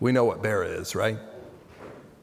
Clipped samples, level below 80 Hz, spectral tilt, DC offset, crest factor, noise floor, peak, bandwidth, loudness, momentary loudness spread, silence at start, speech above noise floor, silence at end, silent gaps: under 0.1%; -62 dBFS; -5.5 dB/octave; under 0.1%; 18 dB; -46 dBFS; -10 dBFS; 16 kHz; -27 LUFS; 23 LU; 0 s; 21 dB; 0.15 s; none